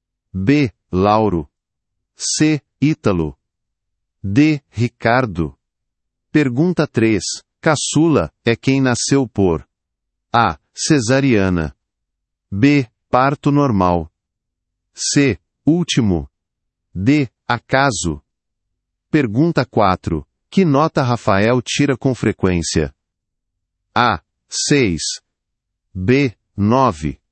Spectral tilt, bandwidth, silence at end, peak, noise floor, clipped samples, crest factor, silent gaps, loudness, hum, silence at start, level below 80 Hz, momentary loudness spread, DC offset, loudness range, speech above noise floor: -5.5 dB/octave; 8.8 kHz; 0.15 s; 0 dBFS; -78 dBFS; under 0.1%; 18 dB; none; -17 LUFS; none; 0.35 s; -44 dBFS; 10 LU; under 0.1%; 3 LU; 63 dB